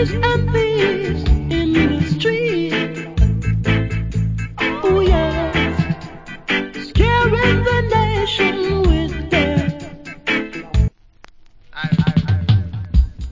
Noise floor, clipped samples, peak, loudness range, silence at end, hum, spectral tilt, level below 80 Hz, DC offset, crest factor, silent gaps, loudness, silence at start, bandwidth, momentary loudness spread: -45 dBFS; under 0.1%; 0 dBFS; 4 LU; 0 s; none; -7 dB/octave; -24 dBFS; under 0.1%; 18 dB; none; -18 LUFS; 0 s; 7.6 kHz; 8 LU